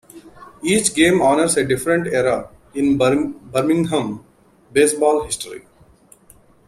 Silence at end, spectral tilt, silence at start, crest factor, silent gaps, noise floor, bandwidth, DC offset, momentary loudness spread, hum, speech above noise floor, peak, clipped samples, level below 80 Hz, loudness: 1.1 s; -4 dB/octave; 0.15 s; 18 dB; none; -50 dBFS; 15.5 kHz; under 0.1%; 12 LU; none; 33 dB; -2 dBFS; under 0.1%; -50 dBFS; -18 LUFS